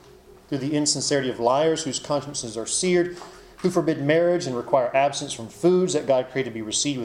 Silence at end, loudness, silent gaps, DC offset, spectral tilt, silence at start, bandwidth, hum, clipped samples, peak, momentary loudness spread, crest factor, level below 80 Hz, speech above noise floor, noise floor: 0 s; -23 LUFS; none; under 0.1%; -4 dB/octave; 0.5 s; 12.5 kHz; none; under 0.1%; -6 dBFS; 9 LU; 18 dB; -58 dBFS; 26 dB; -49 dBFS